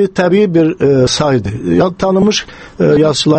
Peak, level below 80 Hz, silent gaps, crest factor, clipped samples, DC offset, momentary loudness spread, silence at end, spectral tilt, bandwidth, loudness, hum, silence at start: 0 dBFS; -38 dBFS; none; 10 dB; under 0.1%; under 0.1%; 5 LU; 0 s; -5.5 dB/octave; 8.8 kHz; -12 LUFS; none; 0 s